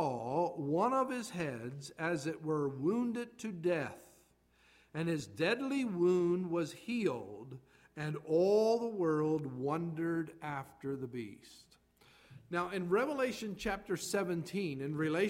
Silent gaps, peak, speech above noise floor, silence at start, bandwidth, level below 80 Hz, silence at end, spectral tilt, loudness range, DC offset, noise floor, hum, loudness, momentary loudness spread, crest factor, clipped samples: none; -18 dBFS; 34 dB; 0 s; 16 kHz; -68 dBFS; 0 s; -6 dB/octave; 5 LU; under 0.1%; -69 dBFS; none; -36 LUFS; 12 LU; 16 dB; under 0.1%